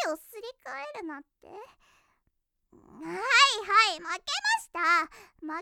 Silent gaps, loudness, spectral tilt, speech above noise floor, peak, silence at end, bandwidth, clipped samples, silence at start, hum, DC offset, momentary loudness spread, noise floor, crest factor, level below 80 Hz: none; -24 LUFS; 0 dB/octave; 48 dB; -8 dBFS; 0 s; 18.5 kHz; under 0.1%; 0 s; none; under 0.1%; 22 LU; -77 dBFS; 22 dB; -70 dBFS